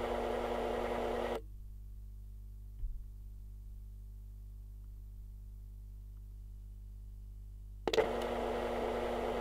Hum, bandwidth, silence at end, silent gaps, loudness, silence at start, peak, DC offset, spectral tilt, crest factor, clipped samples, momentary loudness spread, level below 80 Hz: 50 Hz at -50 dBFS; 16 kHz; 0 s; none; -37 LUFS; 0 s; -14 dBFS; under 0.1%; -5.5 dB/octave; 26 dB; under 0.1%; 16 LU; -48 dBFS